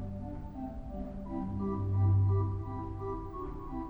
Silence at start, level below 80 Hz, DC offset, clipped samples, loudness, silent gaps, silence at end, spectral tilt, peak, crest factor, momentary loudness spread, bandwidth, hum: 0 s; -44 dBFS; under 0.1%; under 0.1%; -35 LUFS; none; 0 s; -11.5 dB/octave; -20 dBFS; 14 dB; 14 LU; 2.2 kHz; none